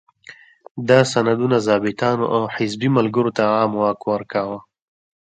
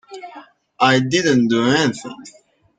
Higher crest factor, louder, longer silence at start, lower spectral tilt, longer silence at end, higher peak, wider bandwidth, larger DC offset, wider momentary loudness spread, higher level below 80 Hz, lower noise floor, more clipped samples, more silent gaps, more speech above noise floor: about the same, 20 dB vs 18 dB; second, -19 LUFS vs -16 LUFS; first, 0.3 s vs 0.1 s; first, -6 dB/octave vs -4.5 dB/octave; first, 0.7 s vs 0.5 s; about the same, 0 dBFS vs -2 dBFS; about the same, 9.2 kHz vs 9.2 kHz; neither; second, 9 LU vs 21 LU; about the same, -60 dBFS vs -58 dBFS; about the same, -45 dBFS vs -43 dBFS; neither; first, 0.71-0.75 s vs none; about the same, 27 dB vs 26 dB